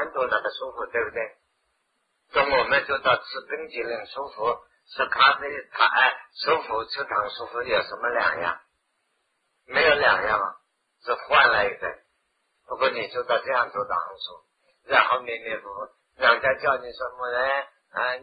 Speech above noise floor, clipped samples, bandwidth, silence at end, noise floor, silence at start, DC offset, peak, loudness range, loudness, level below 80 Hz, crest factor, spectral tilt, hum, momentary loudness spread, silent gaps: 49 dB; under 0.1%; 5 kHz; 0 s; -73 dBFS; 0 s; under 0.1%; -4 dBFS; 3 LU; -24 LUFS; -60 dBFS; 22 dB; -5.5 dB/octave; none; 15 LU; none